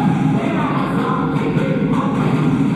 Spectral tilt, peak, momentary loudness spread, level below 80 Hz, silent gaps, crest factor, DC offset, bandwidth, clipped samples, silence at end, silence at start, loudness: -8 dB/octave; -4 dBFS; 2 LU; -44 dBFS; none; 12 dB; under 0.1%; 11.5 kHz; under 0.1%; 0 s; 0 s; -17 LUFS